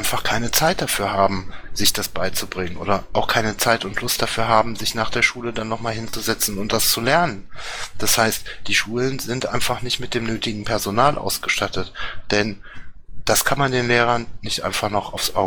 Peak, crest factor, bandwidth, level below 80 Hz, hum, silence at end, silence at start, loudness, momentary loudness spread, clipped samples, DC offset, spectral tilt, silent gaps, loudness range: 0 dBFS; 20 dB; 19 kHz; -40 dBFS; none; 0 s; 0 s; -20 LUFS; 9 LU; under 0.1%; under 0.1%; -3 dB/octave; none; 2 LU